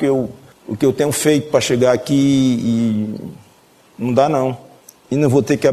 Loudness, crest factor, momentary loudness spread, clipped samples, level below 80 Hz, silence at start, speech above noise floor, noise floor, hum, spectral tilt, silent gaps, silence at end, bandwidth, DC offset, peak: -16 LUFS; 16 dB; 14 LU; under 0.1%; -54 dBFS; 0 s; 35 dB; -50 dBFS; none; -5.5 dB/octave; none; 0 s; 14 kHz; under 0.1%; 0 dBFS